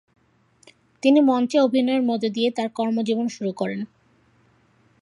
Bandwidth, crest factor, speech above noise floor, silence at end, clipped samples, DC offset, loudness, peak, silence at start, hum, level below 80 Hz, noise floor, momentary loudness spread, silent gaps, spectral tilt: 11 kHz; 18 dB; 40 dB; 1.2 s; under 0.1%; under 0.1%; -22 LUFS; -4 dBFS; 1.05 s; none; -74 dBFS; -60 dBFS; 11 LU; none; -5.5 dB/octave